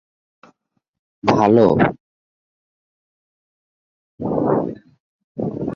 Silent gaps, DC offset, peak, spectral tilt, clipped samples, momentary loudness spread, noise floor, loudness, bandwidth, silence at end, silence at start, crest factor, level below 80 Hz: 2.00-4.18 s, 5.00-5.35 s; under 0.1%; -2 dBFS; -8 dB/octave; under 0.1%; 16 LU; -70 dBFS; -18 LUFS; 7.4 kHz; 0 s; 1.25 s; 20 dB; -52 dBFS